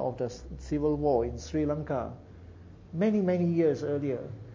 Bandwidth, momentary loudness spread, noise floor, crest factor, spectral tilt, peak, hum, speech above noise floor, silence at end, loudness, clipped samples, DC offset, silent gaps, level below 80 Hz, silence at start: 7.6 kHz; 17 LU; -49 dBFS; 16 dB; -8 dB/octave; -14 dBFS; none; 20 dB; 0 s; -29 LUFS; under 0.1%; under 0.1%; none; -48 dBFS; 0 s